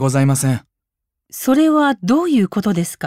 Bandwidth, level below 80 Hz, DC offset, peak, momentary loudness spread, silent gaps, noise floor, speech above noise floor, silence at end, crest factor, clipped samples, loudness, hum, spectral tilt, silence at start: 16 kHz; -58 dBFS; under 0.1%; -4 dBFS; 9 LU; none; -81 dBFS; 65 dB; 0 s; 12 dB; under 0.1%; -16 LUFS; none; -6 dB/octave; 0 s